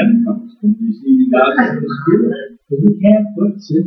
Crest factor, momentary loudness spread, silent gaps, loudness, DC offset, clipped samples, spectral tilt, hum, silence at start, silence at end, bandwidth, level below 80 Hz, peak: 12 dB; 7 LU; none; -14 LUFS; under 0.1%; under 0.1%; -9.5 dB/octave; none; 0 s; 0 s; 6 kHz; -60 dBFS; 0 dBFS